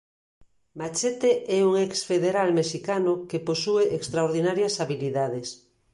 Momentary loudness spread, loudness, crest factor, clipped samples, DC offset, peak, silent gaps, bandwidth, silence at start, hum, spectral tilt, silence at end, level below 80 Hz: 6 LU; -25 LUFS; 14 dB; under 0.1%; under 0.1%; -10 dBFS; none; 11.5 kHz; 0.75 s; none; -4.5 dB/octave; 0.35 s; -66 dBFS